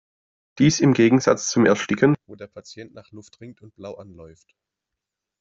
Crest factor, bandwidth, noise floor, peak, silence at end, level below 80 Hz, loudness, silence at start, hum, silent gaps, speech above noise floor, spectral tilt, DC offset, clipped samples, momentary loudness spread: 20 dB; 7.8 kHz; -85 dBFS; -4 dBFS; 1.15 s; -60 dBFS; -19 LUFS; 0.55 s; none; none; 63 dB; -5.5 dB/octave; under 0.1%; under 0.1%; 24 LU